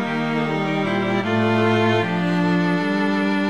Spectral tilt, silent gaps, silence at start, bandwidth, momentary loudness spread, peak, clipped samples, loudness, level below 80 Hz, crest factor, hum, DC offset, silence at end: -7 dB/octave; none; 0 s; 11 kHz; 4 LU; -6 dBFS; under 0.1%; -20 LUFS; -64 dBFS; 14 dB; none; 0.5%; 0 s